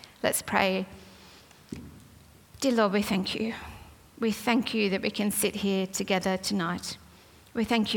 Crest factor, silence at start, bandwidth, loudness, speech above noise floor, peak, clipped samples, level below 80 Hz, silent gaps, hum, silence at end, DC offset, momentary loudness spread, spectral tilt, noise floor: 22 dB; 0.05 s; 18 kHz; -28 LUFS; 27 dB; -6 dBFS; under 0.1%; -60 dBFS; none; none; 0 s; under 0.1%; 18 LU; -4 dB/octave; -54 dBFS